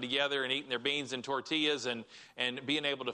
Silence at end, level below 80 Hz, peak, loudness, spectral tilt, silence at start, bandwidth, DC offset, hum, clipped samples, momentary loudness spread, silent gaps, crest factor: 0 s; -78 dBFS; -16 dBFS; -33 LUFS; -3 dB/octave; 0 s; 10.5 kHz; under 0.1%; none; under 0.1%; 6 LU; none; 18 dB